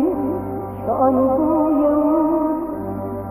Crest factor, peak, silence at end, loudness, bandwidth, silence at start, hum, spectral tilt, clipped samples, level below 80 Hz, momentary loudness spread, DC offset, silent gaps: 14 dB; -4 dBFS; 0 s; -19 LUFS; 15 kHz; 0 s; none; -11 dB/octave; under 0.1%; -44 dBFS; 10 LU; 0.1%; none